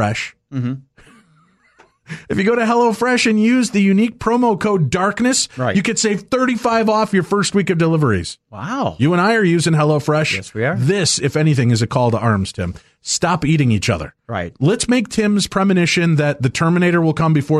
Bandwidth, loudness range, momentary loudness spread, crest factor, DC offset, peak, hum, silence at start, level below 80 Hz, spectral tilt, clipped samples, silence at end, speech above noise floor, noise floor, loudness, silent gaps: 12.5 kHz; 3 LU; 9 LU; 12 dB; under 0.1%; -4 dBFS; none; 0 s; -46 dBFS; -5 dB/octave; under 0.1%; 0 s; 39 dB; -55 dBFS; -16 LUFS; none